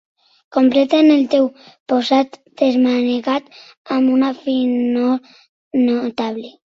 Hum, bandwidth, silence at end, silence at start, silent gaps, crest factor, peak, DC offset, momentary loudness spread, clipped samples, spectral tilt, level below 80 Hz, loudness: none; 7.2 kHz; 0.25 s; 0.5 s; 1.80-1.86 s, 3.77-3.85 s, 5.49-5.71 s; 14 dB; -2 dBFS; under 0.1%; 11 LU; under 0.1%; -5.5 dB/octave; -64 dBFS; -17 LUFS